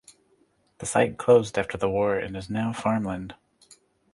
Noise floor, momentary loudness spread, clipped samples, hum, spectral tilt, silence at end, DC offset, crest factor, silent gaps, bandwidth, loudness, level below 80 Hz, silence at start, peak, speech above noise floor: -65 dBFS; 13 LU; under 0.1%; none; -5.5 dB/octave; 0.8 s; under 0.1%; 20 dB; none; 11.5 kHz; -25 LUFS; -54 dBFS; 0.8 s; -6 dBFS; 41 dB